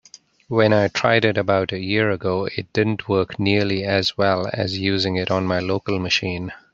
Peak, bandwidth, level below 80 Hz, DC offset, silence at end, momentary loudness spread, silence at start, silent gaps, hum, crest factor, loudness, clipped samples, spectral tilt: -2 dBFS; 7.6 kHz; -56 dBFS; under 0.1%; 0.2 s; 6 LU; 0.5 s; none; none; 18 dB; -20 LUFS; under 0.1%; -5.5 dB/octave